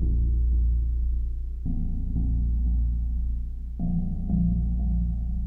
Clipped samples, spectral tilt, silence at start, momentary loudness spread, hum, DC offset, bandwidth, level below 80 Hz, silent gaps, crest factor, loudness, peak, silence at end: under 0.1%; -12.5 dB/octave; 0 s; 7 LU; none; under 0.1%; 0.8 kHz; -26 dBFS; none; 10 dB; -28 LUFS; -14 dBFS; 0 s